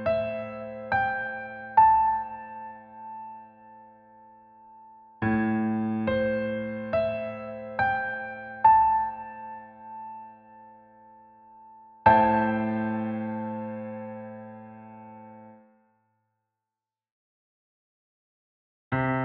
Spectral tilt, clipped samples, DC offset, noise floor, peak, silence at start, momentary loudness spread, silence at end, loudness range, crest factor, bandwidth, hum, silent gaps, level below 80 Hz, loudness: -5.5 dB/octave; under 0.1%; under 0.1%; under -90 dBFS; -6 dBFS; 0 s; 24 LU; 0 s; 13 LU; 24 dB; 5 kHz; none; 17.11-18.91 s; -56 dBFS; -26 LUFS